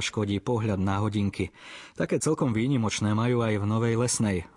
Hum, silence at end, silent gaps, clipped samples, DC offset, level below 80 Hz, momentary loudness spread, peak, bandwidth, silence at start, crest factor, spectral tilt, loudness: none; 0.1 s; none; under 0.1%; under 0.1%; -58 dBFS; 8 LU; -14 dBFS; 11.5 kHz; 0 s; 14 dB; -5.5 dB/octave; -27 LUFS